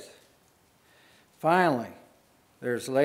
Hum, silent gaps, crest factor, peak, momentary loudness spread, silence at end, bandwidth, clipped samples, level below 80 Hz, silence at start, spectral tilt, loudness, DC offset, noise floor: none; none; 22 dB; -8 dBFS; 18 LU; 0 s; 16 kHz; under 0.1%; -78 dBFS; 0 s; -5.5 dB/octave; -27 LUFS; under 0.1%; -63 dBFS